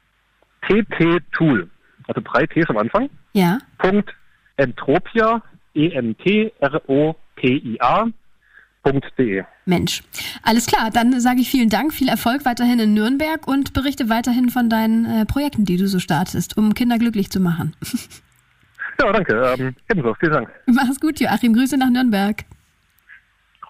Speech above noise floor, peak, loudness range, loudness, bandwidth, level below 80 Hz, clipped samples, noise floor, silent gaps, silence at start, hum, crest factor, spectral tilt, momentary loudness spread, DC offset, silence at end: 43 dB; -4 dBFS; 3 LU; -19 LUFS; 16 kHz; -44 dBFS; under 0.1%; -61 dBFS; none; 0.6 s; none; 14 dB; -5.5 dB/octave; 8 LU; under 0.1%; 1.25 s